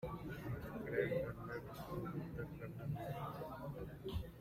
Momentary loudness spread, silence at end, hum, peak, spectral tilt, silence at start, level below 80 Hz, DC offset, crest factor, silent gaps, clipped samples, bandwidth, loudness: 8 LU; 0 s; none; -26 dBFS; -7.5 dB/octave; 0 s; -58 dBFS; under 0.1%; 20 dB; none; under 0.1%; 16 kHz; -46 LUFS